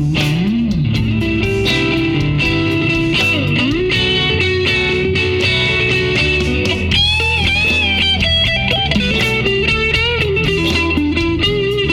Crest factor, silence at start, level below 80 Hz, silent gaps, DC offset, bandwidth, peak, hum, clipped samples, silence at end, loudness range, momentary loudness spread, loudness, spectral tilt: 14 dB; 0 s; -28 dBFS; none; under 0.1%; 15 kHz; -2 dBFS; none; under 0.1%; 0 s; 2 LU; 4 LU; -14 LUFS; -5 dB/octave